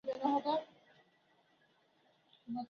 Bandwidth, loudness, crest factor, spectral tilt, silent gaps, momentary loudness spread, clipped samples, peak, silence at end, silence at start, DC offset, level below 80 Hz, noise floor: 7 kHz; -37 LUFS; 22 dB; -3.5 dB/octave; none; 24 LU; under 0.1%; -20 dBFS; 0.05 s; 0.05 s; under 0.1%; -86 dBFS; -73 dBFS